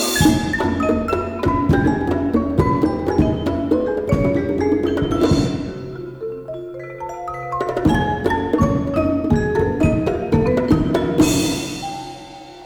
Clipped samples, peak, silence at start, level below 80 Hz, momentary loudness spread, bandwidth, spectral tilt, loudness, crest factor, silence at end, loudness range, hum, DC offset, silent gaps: under 0.1%; -4 dBFS; 0 s; -34 dBFS; 13 LU; over 20 kHz; -6 dB/octave; -19 LUFS; 16 dB; 0 s; 4 LU; none; under 0.1%; none